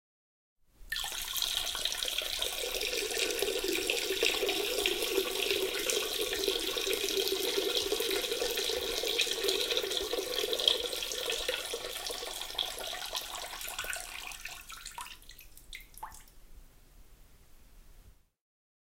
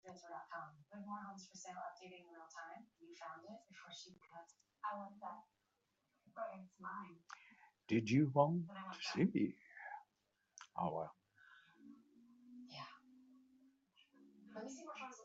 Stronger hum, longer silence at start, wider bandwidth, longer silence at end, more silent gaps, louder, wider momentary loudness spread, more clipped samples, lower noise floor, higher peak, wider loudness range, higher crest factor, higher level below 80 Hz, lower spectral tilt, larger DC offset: neither; first, 0.8 s vs 0.05 s; first, 16.5 kHz vs 8 kHz; first, 0.85 s vs 0 s; neither; first, -32 LUFS vs -44 LUFS; second, 14 LU vs 23 LU; neither; second, -58 dBFS vs -85 dBFS; first, -8 dBFS vs -18 dBFS; second, 12 LU vs 16 LU; about the same, 26 dB vs 28 dB; first, -56 dBFS vs -86 dBFS; second, -0.5 dB/octave vs -6 dB/octave; neither